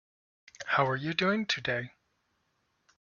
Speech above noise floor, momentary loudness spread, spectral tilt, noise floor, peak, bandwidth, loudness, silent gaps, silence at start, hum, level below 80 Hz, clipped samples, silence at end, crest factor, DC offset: 46 dB; 12 LU; -5 dB/octave; -76 dBFS; -12 dBFS; 7.4 kHz; -30 LUFS; none; 0.6 s; none; -70 dBFS; under 0.1%; 1.15 s; 22 dB; under 0.1%